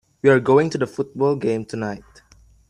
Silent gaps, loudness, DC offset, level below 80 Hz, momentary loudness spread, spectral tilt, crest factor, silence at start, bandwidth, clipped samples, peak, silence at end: none; -20 LUFS; under 0.1%; -56 dBFS; 13 LU; -7 dB/octave; 18 dB; 0.25 s; 10.5 kHz; under 0.1%; -2 dBFS; 0.7 s